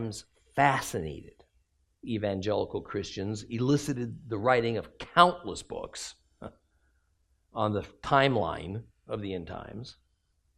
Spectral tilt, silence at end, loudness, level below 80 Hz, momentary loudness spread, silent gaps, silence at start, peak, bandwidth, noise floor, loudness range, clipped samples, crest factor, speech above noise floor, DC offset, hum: -5.5 dB/octave; 0.65 s; -29 LUFS; -58 dBFS; 19 LU; none; 0 s; -4 dBFS; 14 kHz; -72 dBFS; 4 LU; under 0.1%; 28 dB; 43 dB; under 0.1%; none